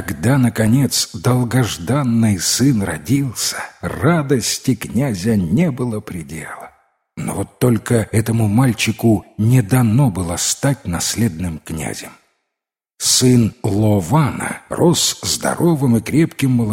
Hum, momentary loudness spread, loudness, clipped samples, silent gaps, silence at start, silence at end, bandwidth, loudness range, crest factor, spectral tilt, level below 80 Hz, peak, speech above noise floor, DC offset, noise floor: none; 11 LU; -17 LUFS; under 0.1%; none; 0 s; 0 s; 16.5 kHz; 4 LU; 16 dB; -5 dB/octave; -44 dBFS; 0 dBFS; 66 dB; under 0.1%; -82 dBFS